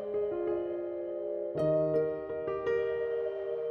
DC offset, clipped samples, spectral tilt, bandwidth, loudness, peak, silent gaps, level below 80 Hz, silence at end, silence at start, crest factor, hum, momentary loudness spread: under 0.1%; under 0.1%; -9 dB/octave; 5.6 kHz; -33 LUFS; -18 dBFS; none; -64 dBFS; 0 s; 0 s; 14 dB; none; 7 LU